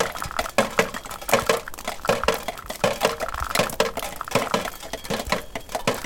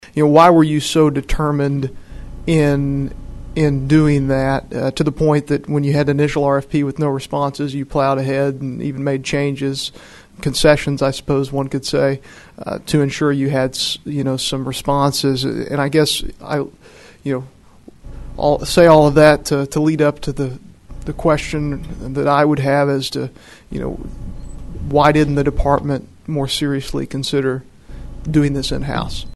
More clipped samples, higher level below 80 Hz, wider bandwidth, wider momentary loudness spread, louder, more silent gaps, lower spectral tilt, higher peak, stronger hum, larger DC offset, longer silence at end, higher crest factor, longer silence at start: neither; second, -42 dBFS vs -32 dBFS; first, 17 kHz vs 12.5 kHz; second, 9 LU vs 14 LU; second, -25 LUFS vs -17 LUFS; neither; second, -3 dB/octave vs -6 dB/octave; about the same, -2 dBFS vs 0 dBFS; neither; second, under 0.1% vs 0.2%; about the same, 0 s vs 0 s; first, 24 dB vs 16 dB; about the same, 0 s vs 0.05 s